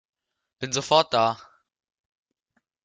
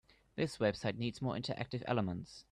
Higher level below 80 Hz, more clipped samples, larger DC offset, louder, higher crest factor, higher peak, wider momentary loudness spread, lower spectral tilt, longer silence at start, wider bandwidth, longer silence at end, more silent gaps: about the same, -68 dBFS vs -66 dBFS; neither; neither; first, -23 LUFS vs -38 LUFS; first, 24 dB vs 18 dB; first, -4 dBFS vs -20 dBFS; first, 16 LU vs 6 LU; second, -3 dB/octave vs -6.5 dB/octave; first, 0.6 s vs 0.35 s; second, 9.4 kHz vs 12 kHz; first, 1.5 s vs 0.1 s; neither